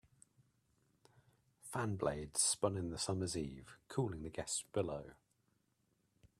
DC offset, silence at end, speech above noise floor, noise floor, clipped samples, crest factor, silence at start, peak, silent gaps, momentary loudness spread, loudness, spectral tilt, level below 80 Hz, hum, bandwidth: under 0.1%; 1.25 s; 40 dB; -80 dBFS; under 0.1%; 24 dB; 1.65 s; -20 dBFS; none; 14 LU; -40 LUFS; -4 dB/octave; -66 dBFS; none; 15 kHz